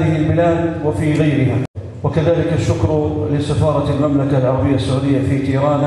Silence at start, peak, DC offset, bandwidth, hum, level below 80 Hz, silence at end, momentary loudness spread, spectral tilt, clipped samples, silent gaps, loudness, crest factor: 0 s; -4 dBFS; under 0.1%; 11.5 kHz; none; -36 dBFS; 0 s; 4 LU; -8 dB/octave; under 0.1%; 1.68-1.74 s; -16 LUFS; 12 dB